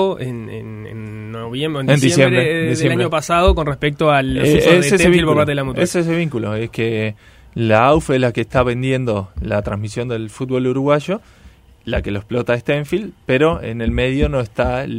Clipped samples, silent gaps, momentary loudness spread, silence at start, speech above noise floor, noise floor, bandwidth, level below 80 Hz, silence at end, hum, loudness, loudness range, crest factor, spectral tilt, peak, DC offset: under 0.1%; none; 13 LU; 0 s; 29 dB; -45 dBFS; 16 kHz; -32 dBFS; 0 s; none; -17 LUFS; 6 LU; 16 dB; -6 dB/octave; 0 dBFS; under 0.1%